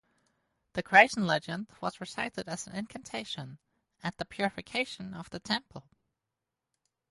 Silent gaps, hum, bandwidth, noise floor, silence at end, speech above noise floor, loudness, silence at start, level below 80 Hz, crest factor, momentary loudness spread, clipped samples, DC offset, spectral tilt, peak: none; none; 11.5 kHz; -88 dBFS; 1.3 s; 56 dB; -30 LUFS; 0.75 s; -66 dBFS; 28 dB; 19 LU; under 0.1%; under 0.1%; -4 dB/octave; -6 dBFS